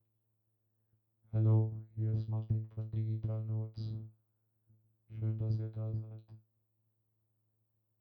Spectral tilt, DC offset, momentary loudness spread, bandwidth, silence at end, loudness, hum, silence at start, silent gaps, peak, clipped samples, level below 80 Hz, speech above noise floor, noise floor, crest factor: -12 dB/octave; under 0.1%; 14 LU; 5.2 kHz; 1.65 s; -37 LUFS; none; 1.3 s; none; -20 dBFS; under 0.1%; -64 dBFS; 45 dB; -80 dBFS; 18 dB